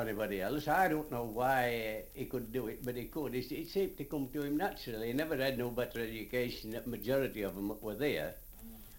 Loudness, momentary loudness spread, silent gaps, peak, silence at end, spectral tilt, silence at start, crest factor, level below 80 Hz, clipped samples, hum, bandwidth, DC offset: -37 LUFS; 9 LU; none; -18 dBFS; 0 s; -5.5 dB/octave; 0 s; 20 dB; -54 dBFS; under 0.1%; none; 17 kHz; under 0.1%